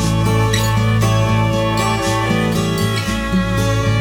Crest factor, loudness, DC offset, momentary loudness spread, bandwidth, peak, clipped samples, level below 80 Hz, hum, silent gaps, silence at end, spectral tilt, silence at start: 12 dB; -16 LUFS; under 0.1%; 3 LU; 18 kHz; -2 dBFS; under 0.1%; -28 dBFS; none; none; 0 s; -5.5 dB/octave; 0 s